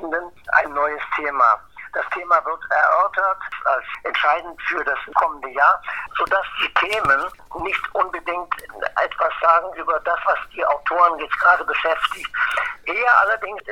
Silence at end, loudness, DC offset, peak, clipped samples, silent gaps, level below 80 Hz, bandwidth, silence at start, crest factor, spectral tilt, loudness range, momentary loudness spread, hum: 0 s; -20 LUFS; 0.4%; -2 dBFS; under 0.1%; none; -52 dBFS; 15.5 kHz; 0 s; 18 dB; -3 dB/octave; 3 LU; 9 LU; none